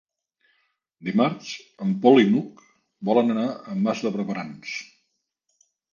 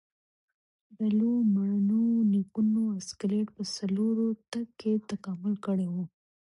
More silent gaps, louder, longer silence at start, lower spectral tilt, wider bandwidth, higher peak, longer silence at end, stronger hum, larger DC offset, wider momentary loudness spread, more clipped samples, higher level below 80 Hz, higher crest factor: neither; first, -23 LUFS vs -29 LUFS; about the same, 1 s vs 1 s; about the same, -6.5 dB/octave vs -7 dB/octave; second, 7.2 kHz vs 11 kHz; first, -2 dBFS vs -18 dBFS; first, 1.1 s vs 0.45 s; neither; neither; first, 17 LU vs 8 LU; neither; about the same, -72 dBFS vs -72 dBFS; first, 22 dB vs 10 dB